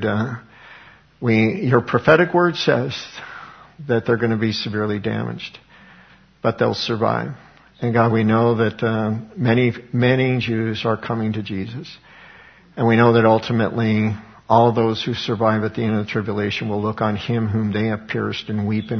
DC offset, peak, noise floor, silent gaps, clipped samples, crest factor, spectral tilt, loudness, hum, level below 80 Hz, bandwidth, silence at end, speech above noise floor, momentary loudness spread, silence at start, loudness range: under 0.1%; 0 dBFS; -49 dBFS; none; under 0.1%; 20 dB; -7.5 dB/octave; -19 LUFS; none; -54 dBFS; 6.6 kHz; 0 s; 31 dB; 13 LU; 0 s; 5 LU